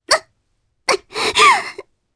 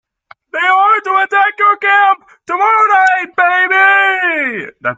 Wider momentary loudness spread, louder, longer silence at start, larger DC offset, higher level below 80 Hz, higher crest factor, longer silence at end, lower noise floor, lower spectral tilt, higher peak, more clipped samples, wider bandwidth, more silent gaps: about the same, 12 LU vs 10 LU; second, -15 LUFS vs -11 LUFS; second, 0.1 s vs 0.55 s; neither; first, -54 dBFS vs -66 dBFS; first, 18 dB vs 12 dB; first, 0.35 s vs 0.05 s; first, -66 dBFS vs -45 dBFS; second, 0 dB/octave vs -3 dB/octave; about the same, 0 dBFS vs 0 dBFS; neither; first, 11 kHz vs 7.8 kHz; neither